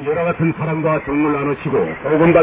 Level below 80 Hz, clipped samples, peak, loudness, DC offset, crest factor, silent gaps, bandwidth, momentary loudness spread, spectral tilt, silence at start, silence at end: -44 dBFS; under 0.1%; 0 dBFS; -18 LUFS; under 0.1%; 16 dB; none; 3.8 kHz; 4 LU; -12 dB/octave; 0 s; 0 s